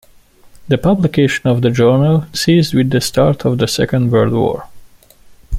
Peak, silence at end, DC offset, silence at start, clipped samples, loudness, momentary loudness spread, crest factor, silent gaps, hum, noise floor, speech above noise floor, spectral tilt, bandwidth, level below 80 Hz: -2 dBFS; 0 s; under 0.1%; 0.6 s; under 0.1%; -14 LUFS; 4 LU; 12 dB; none; none; -45 dBFS; 32 dB; -6 dB/octave; 16 kHz; -42 dBFS